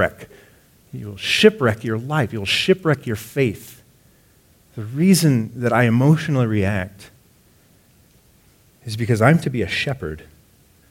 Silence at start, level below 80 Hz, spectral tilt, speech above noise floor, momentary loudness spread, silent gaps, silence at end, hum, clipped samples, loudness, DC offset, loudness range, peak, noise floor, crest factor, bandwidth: 0 s; -52 dBFS; -5.5 dB/octave; 36 dB; 19 LU; none; 0.7 s; none; under 0.1%; -19 LUFS; under 0.1%; 4 LU; 0 dBFS; -55 dBFS; 20 dB; 17 kHz